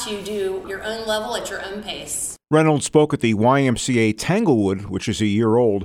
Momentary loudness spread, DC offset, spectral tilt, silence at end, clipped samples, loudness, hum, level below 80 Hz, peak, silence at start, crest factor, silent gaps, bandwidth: 11 LU; under 0.1%; -5 dB/octave; 0 s; under 0.1%; -20 LUFS; none; -48 dBFS; -2 dBFS; 0 s; 18 dB; none; 16 kHz